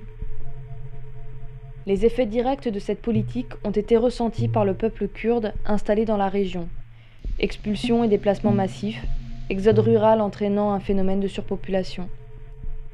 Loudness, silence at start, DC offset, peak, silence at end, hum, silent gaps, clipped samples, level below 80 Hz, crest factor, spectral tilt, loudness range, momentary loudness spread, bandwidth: -23 LUFS; 0 s; under 0.1%; -6 dBFS; 0 s; none; none; under 0.1%; -34 dBFS; 18 dB; -8 dB/octave; 4 LU; 20 LU; 10.5 kHz